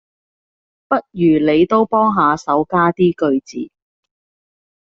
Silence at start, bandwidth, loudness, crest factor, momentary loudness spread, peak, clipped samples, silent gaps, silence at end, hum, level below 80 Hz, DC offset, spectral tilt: 0.9 s; 7.4 kHz; -15 LUFS; 16 dB; 8 LU; -2 dBFS; under 0.1%; none; 1.15 s; none; -54 dBFS; under 0.1%; -6 dB/octave